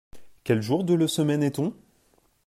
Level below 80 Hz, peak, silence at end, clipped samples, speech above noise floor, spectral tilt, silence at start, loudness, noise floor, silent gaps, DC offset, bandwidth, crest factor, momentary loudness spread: -62 dBFS; -10 dBFS; 0.75 s; under 0.1%; 41 dB; -6 dB/octave; 0.15 s; -25 LUFS; -64 dBFS; none; under 0.1%; 15.5 kHz; 16 dB; 8 LU